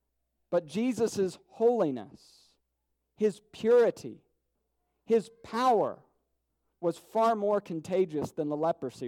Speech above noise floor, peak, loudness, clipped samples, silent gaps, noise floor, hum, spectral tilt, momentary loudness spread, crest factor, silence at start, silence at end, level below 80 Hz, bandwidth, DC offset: 52 dB; -16 dBFS; -29 LUFS; under 0.1%; none; -81 dBFS; none; -6 dB/octave; 9 LU; 16 dB; 0.5 s; 0 s; -74 dBFS; 14.5 kHz; under 0.1%